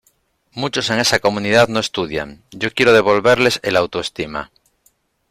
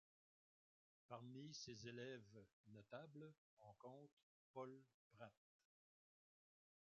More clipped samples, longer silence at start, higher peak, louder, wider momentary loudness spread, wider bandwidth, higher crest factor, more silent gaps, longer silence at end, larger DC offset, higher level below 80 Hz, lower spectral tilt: neither; second, 0.55 s vs 1.1 s; first, -2 dBFS vs -42 dBFS; first, -16 LUFS vs -60 LUFS; about the same, 14 LU vs 12 LU; first, 15.5 kHz vs 7.2 kHz; about the same, 16 dB vs 20 dB; second, none vs 2.53-2.64 s, 3.38-3.57 s, 4.12-4.17 s, 4.23-4.54 s, 4.94-5.10 s; second, 0.85 s vs 1.65 s; neither; first, -50 dBFS vs under -90 dBFS; about the same, -4 dB/octave vs -4.5 dB/octave